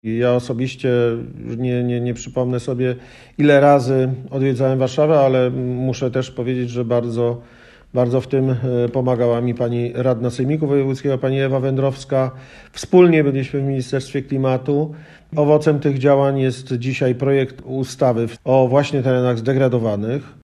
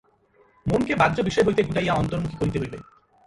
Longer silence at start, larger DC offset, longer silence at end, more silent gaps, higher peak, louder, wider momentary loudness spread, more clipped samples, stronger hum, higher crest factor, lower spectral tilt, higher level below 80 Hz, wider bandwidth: second, 0.05 s vs 0.65 s; neither; second, 0.1 s vs 0.45 s; neither; first, 0 dBFS vs -6 dBFS; first, -18 LUFS vs -23 LUFS; second, 9 LU vs 12 LU; neither; neither; about the same, 18 dB vs 18 dB; about the same, -7.5 dB/octave vs -6.5 dB/octave; second, -52 dBFS vs -44 dBFS; about the same, 11 kHz vs 11.5 kHz